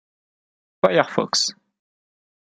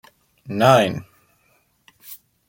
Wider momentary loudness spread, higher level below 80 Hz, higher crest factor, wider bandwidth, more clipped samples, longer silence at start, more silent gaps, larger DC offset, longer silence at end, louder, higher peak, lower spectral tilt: second, 4 LU vs 25 LU; second, -66 dBFS vs -60 dBFS; about the same, 24 dB vs 22 dB; second, 12 kHz vs 16.5 kHz; neither; first, 0.85 s vs 0.45 s; neither; neither; first, 1.05 s vs 0.35 s; second, -20 LUFS vs -17 LUFS; about the same, -2 dBFS vs 0 dBFS; second, -3 dB/octave vs -5.5 dB/octave